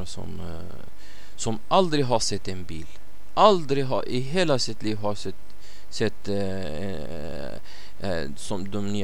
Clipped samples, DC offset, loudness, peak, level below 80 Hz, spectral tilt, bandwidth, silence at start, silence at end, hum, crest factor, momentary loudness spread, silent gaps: under 0.1%; 6%; -26 LUFS; -4 dBFS; -48 dBFS; -5 dB/octave; 18 kHz; 0 s; 0 s; none; 24 dB; 18 LU; none